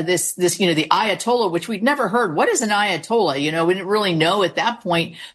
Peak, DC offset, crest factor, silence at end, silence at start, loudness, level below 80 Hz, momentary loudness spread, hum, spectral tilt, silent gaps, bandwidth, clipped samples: -2 dBFS; under 0.1%; 18 dB; 0.05 s; 0 s; -19 LUFS; -64 dBFS; 3 LU; none; -3.5 dB/octave; none; 12.5 kHz; under 0.1%